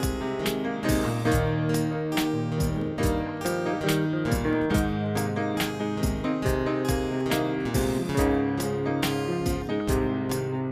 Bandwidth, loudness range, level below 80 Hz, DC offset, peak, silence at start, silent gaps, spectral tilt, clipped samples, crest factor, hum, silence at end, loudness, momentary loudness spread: 15.5 kHz; 0 LU; -38 dBFS; under 0.1%; -10 dBFS; 0 s; none; -6 dB/octave; under 0.1%; 16 dB; none; 0 s; -27 LUFS; 4 LU